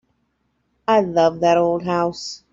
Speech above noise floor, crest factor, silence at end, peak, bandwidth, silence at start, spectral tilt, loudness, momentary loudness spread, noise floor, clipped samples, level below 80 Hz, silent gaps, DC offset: 51 dB; 16 dB; 0.15 s; -4 dBFS; 7.8 kHz; 0.9 s; -5.5 dB/octave; -19 LUFS; 10 LU; -69 dBFS; under 0.1%; -56 dBFS; none; under 0.1%